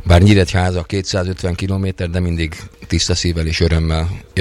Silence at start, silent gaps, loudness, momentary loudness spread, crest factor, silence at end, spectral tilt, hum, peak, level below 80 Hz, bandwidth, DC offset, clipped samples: 0 s; none; -17 LUFS; 10 LU; 14 dB; 0 s; -5.5 dB/octave; none; -2 dBFS; -26 dBFS; 11.5 kHz; under 0.1%; under 0.1%